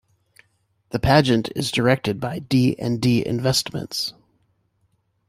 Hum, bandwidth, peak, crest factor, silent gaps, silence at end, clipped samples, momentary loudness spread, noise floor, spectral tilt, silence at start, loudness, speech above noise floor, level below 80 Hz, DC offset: none; 15.5 kHz; -2 dBFS; 20 dB; none; 1.15 s; under 0.1%; 10 LU; -67 dBFS; -5.5 dB/octave; 0.95 s; -21 LUFS; 47 dB; -46 dBFS; under 0.1%